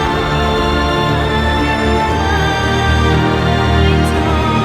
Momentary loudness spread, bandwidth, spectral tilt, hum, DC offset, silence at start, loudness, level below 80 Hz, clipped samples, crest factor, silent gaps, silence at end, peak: 2 LU; 14 kHz; -6 dB/octave; none; under 0.1%; 0 s; -14 LUFS; -22 dBFS; under 0.1%; 12 dB; none; 0 s; 0 dBFS